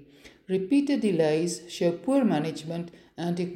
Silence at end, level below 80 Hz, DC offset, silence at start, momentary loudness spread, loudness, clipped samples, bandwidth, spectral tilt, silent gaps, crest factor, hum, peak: 0 s; -68 dBFS; under 0.1%; 0 s; 11 LU; -27 LUFS; under 0.1%; 13.5 kHz; -6 dB/octave; none; 16 dB; none; -10 dBFS